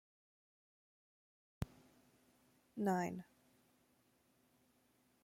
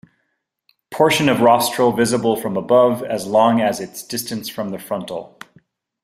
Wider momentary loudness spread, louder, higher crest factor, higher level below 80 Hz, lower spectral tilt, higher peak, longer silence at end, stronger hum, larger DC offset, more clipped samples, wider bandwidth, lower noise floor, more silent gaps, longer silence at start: about the same, 14 LU vs 13 LU; second, -43 LUFS vs -17 LUFS; first, 24 dB vs 18 dB; second, -68 dBFS vs -58 dBFS; first, -7 dB/octave vs -4.5 dB/octave; second, -26 dBFS vs -2 dBFS; first, 2 s vs 0.75 s; neither; neither; neither; about the same, 16.5 kHz vs 16 kHz; first, -76 dBFS vs -72 dBFS; neither; first, 1.6 s vs 0.9 s